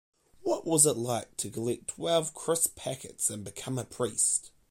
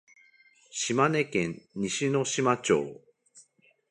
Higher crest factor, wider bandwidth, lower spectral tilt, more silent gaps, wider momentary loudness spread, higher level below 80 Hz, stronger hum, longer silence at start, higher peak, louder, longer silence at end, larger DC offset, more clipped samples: about the same, 22 dB vs 22 dB; first, 16.5 kHz vs 11.5 kHz; about the same, -3.5 dB/octave vs -4 dB/octave; neither; first, 13 LU vs 10 LU; about the same, -64 dBFS vs -68 dBFS; neither; second, 0.4 s vs 0.75 s; about the same, -8 dBFS vs -8 dBFS; about the same, -29 LUFS vs -27 LUFS; second, 0.2 s vs 0.5 s; neither; neither